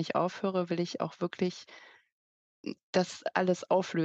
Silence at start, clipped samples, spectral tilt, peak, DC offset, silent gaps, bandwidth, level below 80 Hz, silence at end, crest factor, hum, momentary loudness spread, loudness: 0 s; under 0.1%; -6 dB/octave; -10 dBFS; under 0.1%; 2.12-2.64 s, 2.83-2.93 s; 8.4 kHz; -80 dBFS; 0 s; 22 dB; none; 14 LU; -32 LUFS